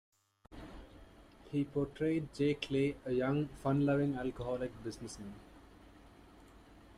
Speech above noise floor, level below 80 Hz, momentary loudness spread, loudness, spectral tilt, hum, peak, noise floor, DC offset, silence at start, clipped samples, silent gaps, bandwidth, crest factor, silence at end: 24 dB; -60 dBFS; 20 LU; -36 LUFS; -7 dB/octave; none; -20 dBFS; -59 dBFS; under 0.1%; 0.5 s; under 0.1%; none; 12 kHz; 18 dB; 0 s